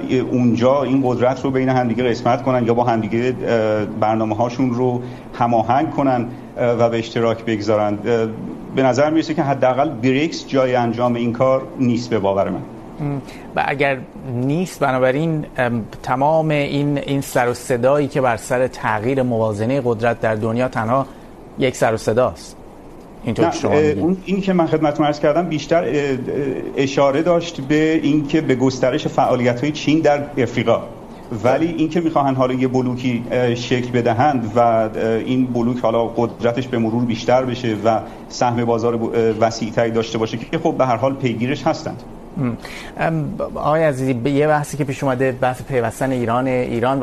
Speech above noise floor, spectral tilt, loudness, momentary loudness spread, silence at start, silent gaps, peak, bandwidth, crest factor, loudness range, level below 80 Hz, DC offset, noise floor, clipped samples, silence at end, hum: 20 dB; -6.5 dB/octave; -18 LUFS; 6 LU; 0 s; none; -4 dBFS; 13 kHz; 14 dB; 3 LU; -44 dBFS; under 0.1%; -38 dBFS; under 0.1%; 0 s; none